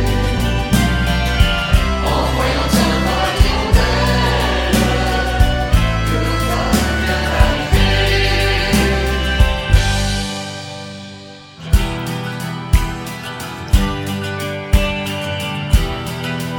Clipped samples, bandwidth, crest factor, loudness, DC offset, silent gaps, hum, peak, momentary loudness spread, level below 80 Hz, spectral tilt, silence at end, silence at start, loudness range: under 0.1%; 18 kHz; 16 dB; -17 LUFS; under 0.1%; none; none; 0 dBFS; 10 LU; -20 dBFS; -5 dB/octave; 0 s; 0 s; 5 LU